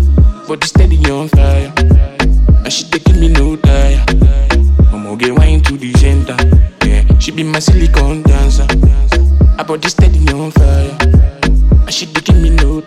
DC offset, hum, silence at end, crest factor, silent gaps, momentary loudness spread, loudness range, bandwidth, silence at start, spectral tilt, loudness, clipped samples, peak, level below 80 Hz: under 0.1%; none; 0.05 s; 8 dB; none; 3 LU; 0 LU; 11 kHz; 0 s; -6 dB/octave; -11 LUFS; under 0.1%; 0 dBFS; -10 dBFS